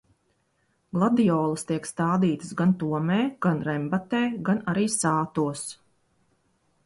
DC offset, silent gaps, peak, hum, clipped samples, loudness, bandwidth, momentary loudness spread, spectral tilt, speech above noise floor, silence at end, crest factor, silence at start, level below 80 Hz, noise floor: under 0.1%; none; -10 dBFS; none; under 0.1%; -25 LUFS; 11.5 kHz; 7 LU; -6 dB/octave; 46 dB; 1.1 s; 16 dB; 0.95 s; -64 dBFS; -70 dBFS